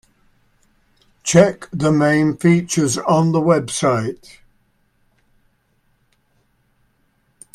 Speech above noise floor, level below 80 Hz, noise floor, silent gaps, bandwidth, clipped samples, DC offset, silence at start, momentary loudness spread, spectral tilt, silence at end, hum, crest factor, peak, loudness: 47 dB; -54 dBFS; -63 dBFS; none; 13.5 kHz; under 0.1%; under 0.1%; 1.25 s; 8 LU; -5.5 dB/octave; 3.4 s; none; 20 dB; 0 dBFS; -17 LUFS